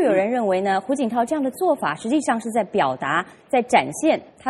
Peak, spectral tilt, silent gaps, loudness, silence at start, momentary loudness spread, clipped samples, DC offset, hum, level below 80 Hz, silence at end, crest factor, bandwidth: -2 dBFS; -4.5 dB/octave; none; -21 LUFS; 0 s; 5 LU; under 0.1%; under 0.1%; none; -64 dBFS; 0 s; 20 dB; 13 kHz